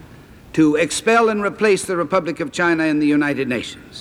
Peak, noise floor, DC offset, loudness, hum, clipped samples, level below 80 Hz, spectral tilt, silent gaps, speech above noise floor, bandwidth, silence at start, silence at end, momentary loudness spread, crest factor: -2 dBFS; -42 dBFS; under 0.1%; -18 LUFS; none; under 0.1%; -52 dBFS; -4.5 dB/octave; none; 25 dB; 13.5 kHz; 0 s; 0 s; 9 LU; 16 dB